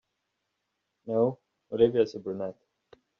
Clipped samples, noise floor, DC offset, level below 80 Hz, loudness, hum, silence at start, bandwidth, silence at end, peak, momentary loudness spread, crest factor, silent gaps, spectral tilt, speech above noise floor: under 0.1%; -81 dBFS; under 0.1%; -70 dBFS; -28 LUFS; none; 1.05 s; 6.6 kHz; 0.65 s; -10 dBFS; 17 LU; 22 dB; none; -7 dB/octave; 55 dB